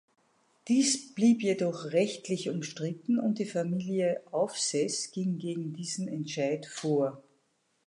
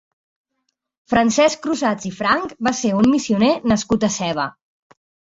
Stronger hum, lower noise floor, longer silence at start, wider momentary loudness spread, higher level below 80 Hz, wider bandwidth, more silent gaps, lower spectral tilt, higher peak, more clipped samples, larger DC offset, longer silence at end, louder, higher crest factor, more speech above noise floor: neither; about the same, -74 dBFS vs -74 dBFS; second, 0.65 s vs 1.1 s; first, 9 LU vs 6 LU; second, -82 dBFS vs -50 dBFS; first, 11.5 kHz vs 8 kHz; neither; about the same, -4.5 dB/octave vs -4.5 dB/octave; second, -14 dBFS vs -2 dBFS; neither; neither; about the same, 0.65 s vs 0.75 s; second, -30 LUFS vs -18 LUFS; about the same, 16 dB vs 18 dB; second, 44 dB vs 56 dB